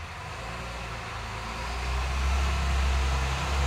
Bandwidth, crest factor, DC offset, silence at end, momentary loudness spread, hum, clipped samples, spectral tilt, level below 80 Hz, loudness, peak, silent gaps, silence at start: 13.5 kHz; 14 dB; under 0.1%; 0 s; 9 LU; none; under 0.1%; -4.5 dB/octave; -30 dBFS; -30 LUFS; -14 dBFS; none; 0 s